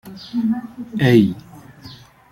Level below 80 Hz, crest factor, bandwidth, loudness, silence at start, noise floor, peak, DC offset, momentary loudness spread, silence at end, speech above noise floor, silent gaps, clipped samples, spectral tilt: -54 dBFS; 18 dB; 16 kHz; -18 LUFS; 0.05 s; -42 dBFS; -2 dBFS; under 0.1%; 23 LU; 0.35 s; 24 dB; none; under 0.1%; -7.5 dB/octave